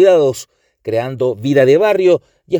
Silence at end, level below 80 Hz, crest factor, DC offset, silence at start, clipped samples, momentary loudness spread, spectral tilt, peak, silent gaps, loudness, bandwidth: 0 s; -58 dBFS; 14 dB; under 0.1%; 0 s; under 0.1%; 10 LU; -6 dB/octave; 0 dBFS; none; -14 LUFS; over 20 kHz